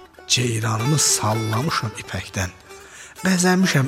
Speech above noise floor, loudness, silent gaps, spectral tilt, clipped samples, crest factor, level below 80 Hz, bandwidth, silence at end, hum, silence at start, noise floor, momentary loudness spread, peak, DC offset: 21 dB; -20 LUFS; none; -3.5 dB/octave; under 0.1%; 18 dB; -52 dBFS; 16 kHz; 0 s; none; 0 s; -41 dBFS; 13 LU; -4 dBFS; under 0.1%